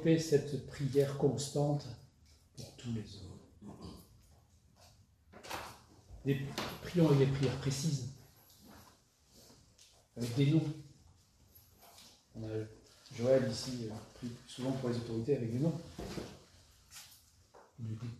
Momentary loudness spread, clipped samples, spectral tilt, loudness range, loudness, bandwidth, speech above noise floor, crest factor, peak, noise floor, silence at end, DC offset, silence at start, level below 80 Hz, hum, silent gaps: 24 LU; under 0.1%; -6.5 dB/octave; 13 LU; -36 LUFS; 14 kHz; 31 dB; 20 dB; -16 dBFS; -66 dBFS; 0 s; under 0.1%; 0 s; -64 dBFS; none; none